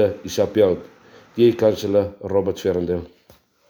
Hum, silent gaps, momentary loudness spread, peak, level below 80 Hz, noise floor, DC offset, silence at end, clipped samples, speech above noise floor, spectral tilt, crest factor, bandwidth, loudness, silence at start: none; none; 10 LU; -4 dBFS; -52 dBFS; -55 dBFS; under 0.1%; 0.6 s; under 0.1%; 35 dB; -6.5 dB/octave; 16 dB; over 20 kHz; -20 LUFS; 0 s